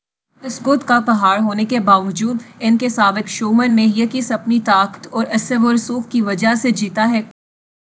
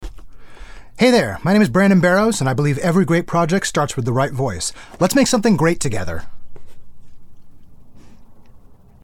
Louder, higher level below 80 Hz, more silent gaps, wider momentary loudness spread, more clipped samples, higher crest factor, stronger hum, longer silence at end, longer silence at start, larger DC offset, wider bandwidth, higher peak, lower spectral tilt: about the same, -16 LUFS vs -17 LUFS; second, -66 dBFS vs -40 dBFS; neither; about the same, 7 LU vs 9 LU; neither; about the same, 16 dB vs 16 dB; neither; first, 0.65 s vs 0.3 s; first, 0.45 s vs 0 s; neither; second, 8 kHz vs 18.5 kHz; about the same, 0 dBFS vs -2 dBFS; about the same, -4.5 dB/octave vs -5.5 dB/octave